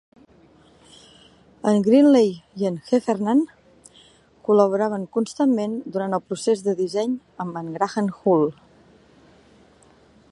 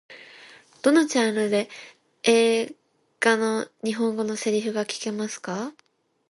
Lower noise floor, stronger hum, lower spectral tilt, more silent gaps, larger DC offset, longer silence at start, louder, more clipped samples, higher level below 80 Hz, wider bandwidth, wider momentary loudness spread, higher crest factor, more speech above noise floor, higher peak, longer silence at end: first, -54 dBFS vs -50 dBFS; neither; first, -6.5 dB/octave vs -3.5 dB/octave; neither; neither; first, 1.65 s vs 0.1 s; first, -21 LUFS vs -24 LUFS; neither; first, -66 dBFS vs -76 dBFS; about the same, 11.5 kHz vs 11.5 kHz; second, 11 LU vs 16 LU; about the same, 20 dB vs 20 dB; first, 34 dB vs 26 dB; about the same, -2 dBFS vs -4 dBFS; first, 1.8 s vs 0.6 s